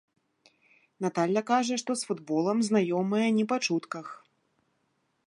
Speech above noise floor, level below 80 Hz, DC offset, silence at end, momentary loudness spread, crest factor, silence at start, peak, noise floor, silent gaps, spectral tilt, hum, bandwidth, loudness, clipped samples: 47 dB; -82 dBFS; under 0.1%; 1.15 s; 8 LU; 18 dB; 1 s; -12 dBFS; -75 dBFS; none; -5 dB/octave; none; 11.5 kHz; -28 LUFS; under 0.1%